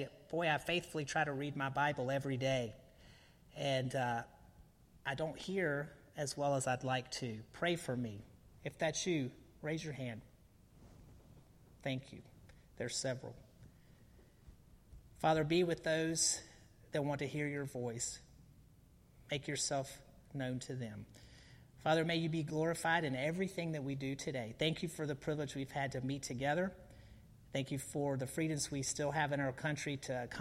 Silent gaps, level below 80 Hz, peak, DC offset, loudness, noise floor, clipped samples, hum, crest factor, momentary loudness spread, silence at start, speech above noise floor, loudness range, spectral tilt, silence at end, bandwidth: none; -66 dBFS; -20 dBFS; under 0.1%; -39 LUFS; -64 dBFS; under 0.1%; none; 20 dB; 13 LU; 0 s; 26 dB; 9 LU; -4.5 dB/octave; 0 s; 16 kHz